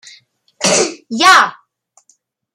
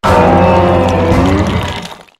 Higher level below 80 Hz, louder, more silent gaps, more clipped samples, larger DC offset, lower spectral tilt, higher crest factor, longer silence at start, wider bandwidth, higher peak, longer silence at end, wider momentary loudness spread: second, -66 dBFS vs -26 dBFS; about the same, -12 LUFS vs -10 LUFS; neither; neither; neither; second, -1 dB/octave vs -7 dB/octave; first, 16 dB vs 10 dB; first, 0.6 s vs 0.05 s; first, 16 kHz vs 14 kHz; about the same, 0 dBFS vs 0 dBFS; first, 1.05 s vs 0.15 s; about the same, 10 LU vs 10 LU